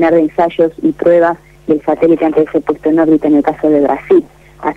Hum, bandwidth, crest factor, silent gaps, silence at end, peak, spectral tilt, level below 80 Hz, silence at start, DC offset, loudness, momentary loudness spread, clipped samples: none; 4.7 kHz; 10 dB; none; 0 s; -2 dBFS; -8.5 dB/octave; -46 dBFS; 0 s; under 0.1%; -12 LUFS; 5 LU; under 0.1%